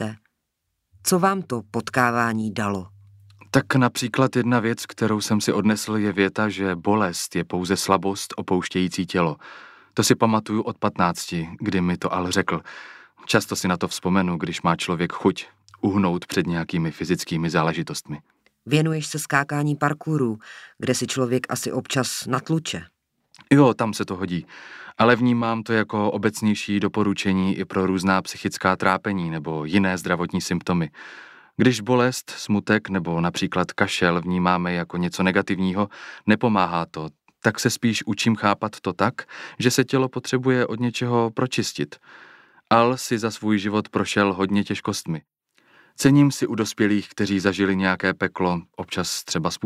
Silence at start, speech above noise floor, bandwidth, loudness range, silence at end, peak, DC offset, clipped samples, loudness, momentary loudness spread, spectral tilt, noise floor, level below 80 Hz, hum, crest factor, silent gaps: 0 s; 55 dB; 15.5 kHz; 3 LU; 0 s; -2 dBFS; under 0.1%; under 0.1%; -22 LUFS; 9 LU; -5 dB/octave; -77 dBFS; -58 dBFS; none; 20 dB; none